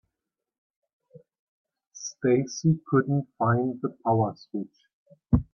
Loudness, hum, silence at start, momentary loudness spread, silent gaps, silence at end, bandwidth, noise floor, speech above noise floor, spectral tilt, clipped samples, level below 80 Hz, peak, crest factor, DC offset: -26 LUFS; none; 1.95 s; 12 LU; 4.93-5.06 s; 0.1 s; 7 kHz; -87 dBFS; 61 dB; -7 dB/octave; under 0.1%; -48 dBFS; -6 dBFS; 20 dB; under 0.1%